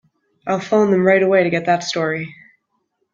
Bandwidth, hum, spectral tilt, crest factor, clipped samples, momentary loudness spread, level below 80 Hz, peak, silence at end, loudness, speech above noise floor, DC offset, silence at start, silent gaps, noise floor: 7.6 kHz; none; -5.5 dB/octave; 16 dB; under 0.1%; 12 LU; -62 dBFS; -2 dBFS; 0.8 s; -17 LUFS; 54 dB; under 0.1%; 0.45 s; none; -70 dBFS